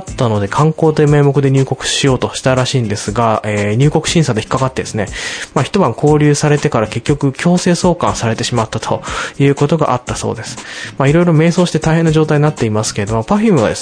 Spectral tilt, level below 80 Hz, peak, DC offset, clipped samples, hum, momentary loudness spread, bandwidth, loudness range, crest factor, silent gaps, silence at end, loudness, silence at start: -5.5 dB/octave; -36 dBFS; 0 dBFS; under 0.1%; under 0.1%; none; 8 LU; 10.5 kHz; 2 LU; 12 dB; none; 0 s; -13 LUFS; 0 s